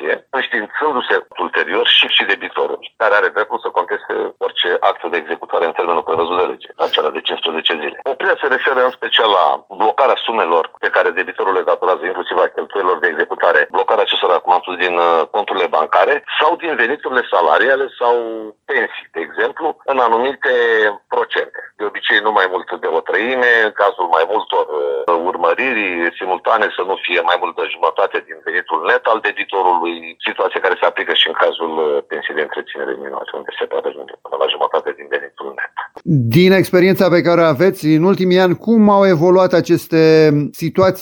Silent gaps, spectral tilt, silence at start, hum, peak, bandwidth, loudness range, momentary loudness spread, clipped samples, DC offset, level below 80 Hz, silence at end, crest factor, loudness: none; -6 dB/octave; 0 s; none; 0 dBFS; 17.5 kHz; 5 LU; 10 LU; under 0.1%; under 0.1%; -60 dBFS; 0 s; 14 dB; -15 LUFS